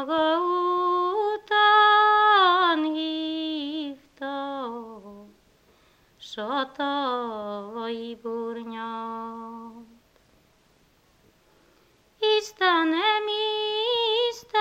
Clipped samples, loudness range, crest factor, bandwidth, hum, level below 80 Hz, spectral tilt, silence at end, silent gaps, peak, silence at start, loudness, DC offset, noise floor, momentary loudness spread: under 0.1%; 16 LU; 18 dB; 15.5 kHz; none; -70 dBFS; -3 dB/octave; 0 s; none; -8 dBFS; 0 s; -24 LUFS; under 0.1%; -62 dBFS; 18 LU